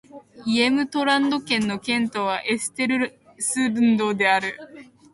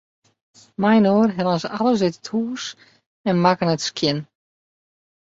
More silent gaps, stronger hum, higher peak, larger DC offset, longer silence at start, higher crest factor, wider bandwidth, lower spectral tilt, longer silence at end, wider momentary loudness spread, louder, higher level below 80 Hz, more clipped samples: second, none vs 3.06-3.24 s; neither; second, -6 dBFS vs -2 dBFS; neither; second, 0.15 s vs 0.8 s; about the same, 16 dB vs 18 dB; first, 11.5 kHz vs 7.8 kHz; second, -3 dB/octave vs -5.5 dB/octave; second, 0.3 s vs 1 s; second, 7 LU vs 13 LU; about the same, -22 LUFS vs -20 LUFS; about the same, -64 dBFS vs -60 dBFS; neither